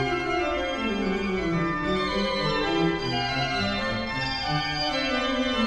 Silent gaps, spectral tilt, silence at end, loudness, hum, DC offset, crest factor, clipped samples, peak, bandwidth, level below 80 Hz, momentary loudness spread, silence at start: none; -5 dB/octave; 0 s; -26 LUFS; none; under 0.1%; 14 dB; under 0.1%; -12 dBFS; 11.5 kHz; -42 dBFS; 2 LU; 0 s